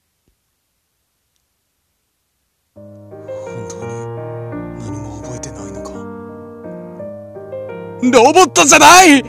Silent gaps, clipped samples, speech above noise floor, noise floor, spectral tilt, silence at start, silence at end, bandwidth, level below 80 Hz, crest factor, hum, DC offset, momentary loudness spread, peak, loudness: none; 0.5%; 61 dB; -67 dBFS; -2.5 dB/octave; 3.3 s; 0 s; over 20 kHz; -46 dBFS; 16 dB; none; under 0.1%; 26 LU; 0 dBFS; -7 LUFS